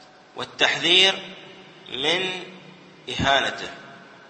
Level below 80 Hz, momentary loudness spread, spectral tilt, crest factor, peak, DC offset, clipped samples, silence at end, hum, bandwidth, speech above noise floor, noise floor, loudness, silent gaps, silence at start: -54 dBFS; 25 LU; -2.5 dB/octave; 22 dB; -2 dBFS; under 0.1%; under 0.1%; 0.3 s; none; 8.8 kHz; 24 dB; -46 dBFS; -20 LUFS; none; 0.35 s